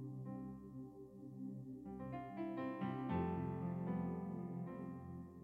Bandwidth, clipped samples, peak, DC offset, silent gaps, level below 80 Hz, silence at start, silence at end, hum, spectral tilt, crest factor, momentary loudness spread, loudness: 4.3 kHz; under 0.1%; -28 dBFS; under 0.1%; none; -68 dBFS; 0 s; 0 s; none; -10 dB/octave; 16 dB; 11 LU; -46 LUFS